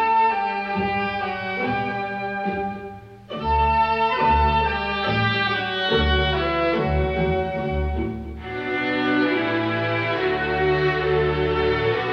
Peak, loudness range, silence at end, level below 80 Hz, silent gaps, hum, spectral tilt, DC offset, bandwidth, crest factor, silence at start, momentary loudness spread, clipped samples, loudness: -8 dBFS; 4 LU; 0 s; -34 dBFS; none; none; -7.5 dB/octave; under 0.1%; 6.6 kHz; 14 dB; 0 s; 8 LU; under 0.1%; -22 LUFS